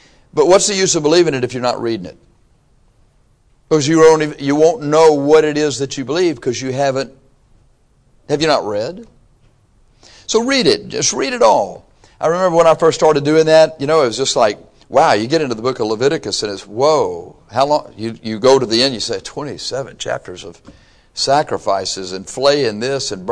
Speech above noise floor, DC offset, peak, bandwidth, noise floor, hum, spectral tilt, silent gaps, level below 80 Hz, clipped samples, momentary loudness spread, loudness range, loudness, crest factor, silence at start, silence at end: 39 dB; under 0.1%; -2 dBFS; 10.5 kHz; -54 dBFS; none; -4 dB/octave; none; -50 dBFS; under 0.1%; 13 LU; 7 LU; -15 LUFS; 14 dB; 0.35 s; 0 s